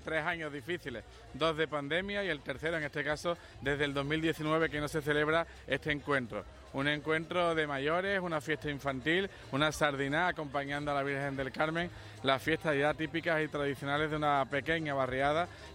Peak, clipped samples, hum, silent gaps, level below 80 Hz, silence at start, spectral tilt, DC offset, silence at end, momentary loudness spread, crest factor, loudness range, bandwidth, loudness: -14 dBFS; under 0.1%; none; none; -56 dBFS; 0 s; -5 dB/octave; under 0.1%; 0 s; 6 LU; 20 dB; 2 LU; 16 kHz; -33 LUFS